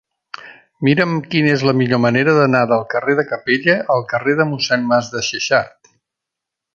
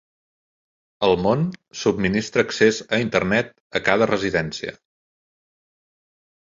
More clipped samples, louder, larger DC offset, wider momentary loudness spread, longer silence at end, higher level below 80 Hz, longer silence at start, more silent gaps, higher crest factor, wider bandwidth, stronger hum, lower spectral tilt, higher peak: neither; first, -16 LUFS vs -21 LUFS; neither; about the same, 7 LU vs 9 LU; second, 1.05 s vs 1.75 s; second, -58 dBFS vs -52 dBFS; second, 0.4 s vs 1 s; second, none vs 3.60-3.70 s; about the same, 16 dB vs 20 dB; about the same, 7.4 kHz vs 7.6 kHz; neither; about the same, -5.5 dB/octave vs -5 dB/octave; about the same, -2 dBFS vs -2 dBFS